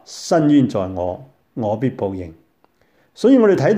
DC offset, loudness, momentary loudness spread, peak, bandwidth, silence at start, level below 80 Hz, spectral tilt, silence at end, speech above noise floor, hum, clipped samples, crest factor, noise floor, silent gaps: under 0.1%; -17 LUFS; 19 LU; -2 dBFS; 11 kHz; 0.1 s; -56 dBFS; -7 dB/octave; 0 s; 43 dB; none; under 0.1%; 16 dB; -60 dBFS; none